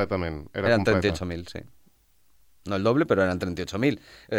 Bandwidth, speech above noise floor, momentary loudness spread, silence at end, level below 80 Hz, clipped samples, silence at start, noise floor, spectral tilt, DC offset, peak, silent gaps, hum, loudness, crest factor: 16.5 kHz; 40 dB; 15 LU; 0 s; -52 dBFS; under 0.1%; 0 s; -66 dBFS; -6.5 dB/octave; under 0.1%; -8 dBFS; none; none; -25 LUFS; 18 dB